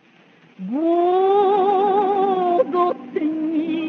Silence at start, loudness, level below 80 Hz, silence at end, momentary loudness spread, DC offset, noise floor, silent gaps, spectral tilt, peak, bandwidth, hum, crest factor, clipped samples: 0.6 s; -19 LUFS; -78 dBFS; 0 s; 8 LU; under 0.1%; -52 dBFS; none; -8 dB/octave; -6 dBFS; 4.7 kHz; none; 14 dB; under 0.1%